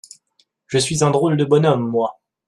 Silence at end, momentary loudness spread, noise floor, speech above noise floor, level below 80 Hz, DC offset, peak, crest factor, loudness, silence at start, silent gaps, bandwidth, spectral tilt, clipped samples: 0.35 s; 7 LU; -63 dBFS; 47 dB; -56 dBFS; under 0.1%; -2 dBFS; 16 dB; -18 LUFS; 0.7 s; none; 12.5 kHz; -5.5 dB/octave; under 0.1%